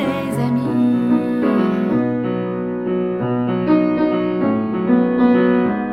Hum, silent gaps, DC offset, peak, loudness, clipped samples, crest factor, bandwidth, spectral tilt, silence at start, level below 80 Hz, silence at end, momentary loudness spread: none; none; under 0.1%; -4 dBFS; -18 LUFS; under 0.1%; 14 dB; 10.5 kHz; -8.5 dB/octave; 0 s; -52 dBFS; 0 s; 6 LU